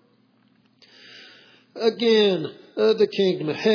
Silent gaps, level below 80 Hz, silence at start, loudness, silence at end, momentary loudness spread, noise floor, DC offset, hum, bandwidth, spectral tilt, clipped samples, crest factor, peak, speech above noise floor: none; -86 dBFS; 1.15 s; -21 LUFS; 0 s; 24 LU; -61 dBFS; under 0.1%; none; 5.4 kHz; -6 dB/octave; under 0.1%; 16 dB; -8 dBFS; 41 dB